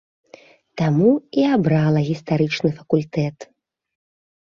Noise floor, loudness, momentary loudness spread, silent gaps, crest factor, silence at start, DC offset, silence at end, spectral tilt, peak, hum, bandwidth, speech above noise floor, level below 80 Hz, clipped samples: -48 dBFS; -19 LUFS; 8 LU; none; 16 dB; 0.75 s; under 0.1%; 1.05 s; -8 dB/octave; -4 dBFS; none; 7.2 kHz; 30 dB; -56 dBFS; under 0.1%